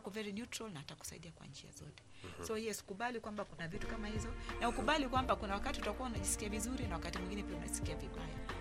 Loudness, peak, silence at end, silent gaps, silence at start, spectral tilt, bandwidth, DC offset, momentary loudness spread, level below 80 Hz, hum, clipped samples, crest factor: -41 LUFS; -18 dBFS; 0 s; none; 0 s; -4 dB/octave; 15.5 kHz; under 0.1%; 17 LU; -50 dBFS; none; under 0.1%; 22 dB